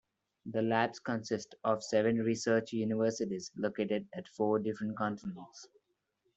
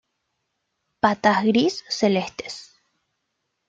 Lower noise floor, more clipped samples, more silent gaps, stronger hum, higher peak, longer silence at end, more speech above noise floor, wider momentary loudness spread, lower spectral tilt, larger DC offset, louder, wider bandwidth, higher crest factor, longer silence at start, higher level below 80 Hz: about the same, -80 dBFS vs -77 dBFS; neither; neither; neither; second, -14 dBFS vs -4 dBFS; second, 0.7 s vs 1.05 s; second, 46 dB vs 56 dB; second, 13 LU vs 16 LU; about the same, -5.5 dB/octave vs -5 dB/octave; neither; second, -34 LUFS vs -21 LUFS; about the same, 8.2 kHz vs 7.8 kHz; about the same, 20 dB vs 20 dB; second, 0.45 s vs 1.05 s; second, -74 dBFS vs -64 dBFS